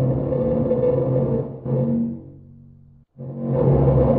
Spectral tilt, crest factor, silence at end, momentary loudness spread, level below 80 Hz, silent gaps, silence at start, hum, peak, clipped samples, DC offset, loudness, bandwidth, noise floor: -12 dB/octave; 16 dB; 0 s; 13 LU; -36 dBFS; none; 0 s; none; -4 dBFS; under 0.1%; under 0.1%; -21 LUFS; 3 kHz; -49 dBFS